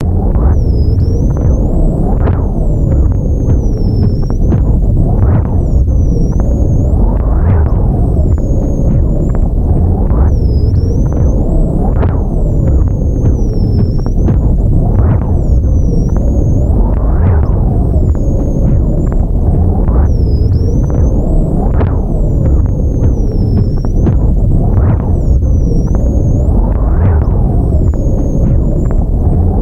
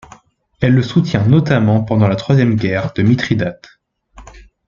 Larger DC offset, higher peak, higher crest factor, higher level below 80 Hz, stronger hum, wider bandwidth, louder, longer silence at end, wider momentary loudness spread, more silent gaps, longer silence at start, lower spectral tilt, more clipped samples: neither; about the same, 0 dBFS vs -2 dBFS; second, 8 dB vs 14 dB; first, -12 dBFS vs -44 dBFS; neither; about the same, 7 kHz vs 7.4 kHz; about the same, -12 LUFS vs -14 LUFS; second, 0 s vs 0.25 s; second, 3 LU vs 6 LU; neither; second, 0 s vs 0.6 s; first, -10.5 dB/octave vs -8 dB/octave; neither